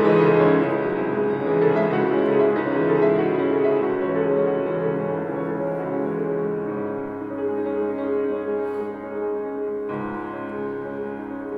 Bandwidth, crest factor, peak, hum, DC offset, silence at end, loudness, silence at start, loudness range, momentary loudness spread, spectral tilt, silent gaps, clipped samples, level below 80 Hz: 5 kHz; 16 dB; -6 dBFS; none; under 0.1%; 0 s; -23 LUFS; 0 s; 7 LU; 11 LU; -9.5 dB/octave; none; under 0.1%; -60 dBFS